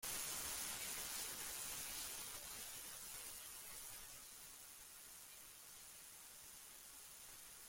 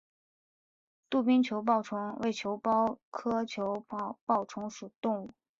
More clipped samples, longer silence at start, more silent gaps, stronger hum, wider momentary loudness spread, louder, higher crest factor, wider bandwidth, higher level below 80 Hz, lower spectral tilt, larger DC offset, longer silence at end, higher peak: neither; second, 0 s vs 1.1 s; second, none vs 3.03-3.12 s, 4.21-4.27 s, 4.96-5.02 s; neither; about the same, 12 LU vs 11 LU; second, -49 LUFS vs -32 LUFS; about the same, 20 dB vs 20 dB; first, 16.5 kHz vs 7.6 kHz; about the same, -72 dBFS vs -74 dBFS; second, 0.5 dB/octave vs -5.5 dB/octave; neither; second, 0 s vs 0.3 s; second, -32 dBFS vs -14 dBFS